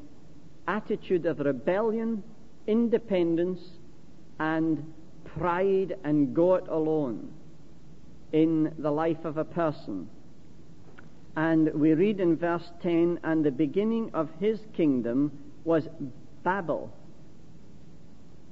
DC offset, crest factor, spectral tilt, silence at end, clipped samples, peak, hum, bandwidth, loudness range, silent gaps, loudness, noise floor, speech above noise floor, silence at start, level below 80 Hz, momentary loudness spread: 0.9%; 16 dB; -9 dB/octave; 0.55 s; under 0.1%; -12 dBFS; none; 7 kHz; 4 LU; none; -28 LUFS; -53 dBFS; 26 dB; 0 s; -60 dBFS; 14 LU